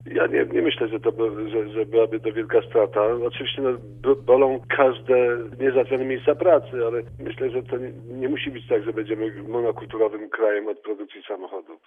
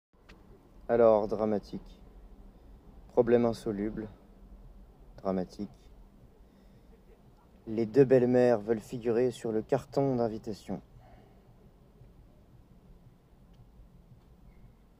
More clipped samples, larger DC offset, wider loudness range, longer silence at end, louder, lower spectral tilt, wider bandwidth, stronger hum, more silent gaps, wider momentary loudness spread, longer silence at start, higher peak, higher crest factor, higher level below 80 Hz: neither; neither; second, 6 LU vs 14 LU; second, 0.1 s vs 1.2 s; first, -23 LUFS vs -29 LUFS; about the same, -8.5 dB/octave vs -8 dB/octave; second, 3.7 kHz vs 14.5 kHz; neither; neither; second, 12 LU vs 19 LU; second, 0 s vs 0.3 s; first, -4 dBFS vs -10 dBFS; about the same, 18 dB vs 22 dB; about the same, -56 dBFS vs -56 dBFS